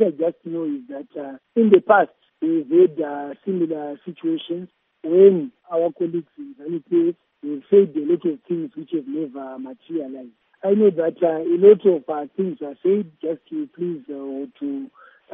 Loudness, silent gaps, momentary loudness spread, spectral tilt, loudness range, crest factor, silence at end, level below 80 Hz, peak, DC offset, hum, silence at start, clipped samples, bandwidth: -20 LUFS; none; 18 LU; -6.5 dB/octave; 4 LU; 20 dB; 0.45 s; -76 dBFS; 0 dBFS; under 0.1%; none; 0 s; under 0.1%; 3.7 kHz